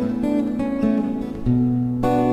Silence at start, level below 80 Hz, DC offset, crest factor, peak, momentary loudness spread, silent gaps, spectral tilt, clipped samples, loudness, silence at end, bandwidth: 0 s; -40 dBFS; under 0.1%; 14 dB; -8 dBFS; 4 LU; none; -9 dB/octave; under 0.1%; -21 LUFS; 0 s; 9 kHz